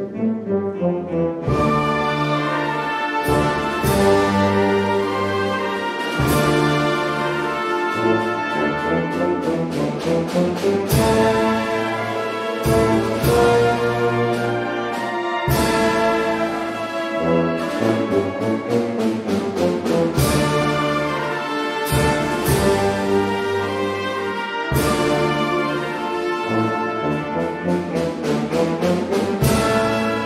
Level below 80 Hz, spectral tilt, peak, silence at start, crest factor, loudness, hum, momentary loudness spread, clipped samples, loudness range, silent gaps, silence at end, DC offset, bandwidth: -38 dBFS; -5.5 dB/octave; -4 dBFS; 0 s; 16 dB; -20 LUFS; none; 6 LU; under 0.1%; 2 LU; none; 0 s; under 0.1%; 16 kHz